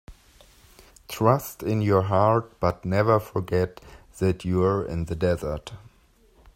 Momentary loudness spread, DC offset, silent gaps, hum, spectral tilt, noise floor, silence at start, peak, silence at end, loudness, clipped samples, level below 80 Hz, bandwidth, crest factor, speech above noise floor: 9 LU; under 0.1%; none; none; -7.5 dB/octave; -59 dBFS; 0.1 s; -4 dBFS; 0.8 s; -24 LUFS; under 0.1%; -48 dBFS; 16 kHz; 22 dB; 35 dB